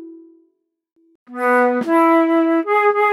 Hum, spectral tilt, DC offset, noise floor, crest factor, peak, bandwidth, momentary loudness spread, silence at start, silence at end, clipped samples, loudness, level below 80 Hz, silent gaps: none; -5.5 dB/octave; under 0.1%; -65 dBFS; 12 dB; -4 dBFS; 13 kHz; 5 LU; 0 s; 0 s; under 0.1%; -15 LUFS; -84 dBFS; 1.15-1.26 s